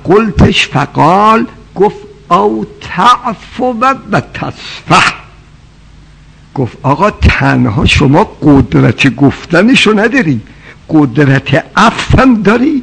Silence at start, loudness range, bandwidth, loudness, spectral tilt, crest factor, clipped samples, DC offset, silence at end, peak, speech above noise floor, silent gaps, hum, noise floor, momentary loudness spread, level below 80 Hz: 0.05 s; 6 LU; 11 kHz; -9 LUFS; -6 dB/octave; 10 dB; 4%; under 0.1%; 0 s; 0 dBFS; 29 dB; none; none; -38 dBFS; 11 LU; -24 dBFS